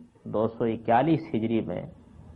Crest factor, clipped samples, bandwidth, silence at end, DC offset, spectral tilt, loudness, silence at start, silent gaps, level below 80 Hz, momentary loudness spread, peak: 18 dB; under 0.1%; 5.4 kHz; 0 s; under 0.1%; -10 dB/octave; -27 LUFS; 0 s; none; -58 dBFS; 12 LU; -10 dBFS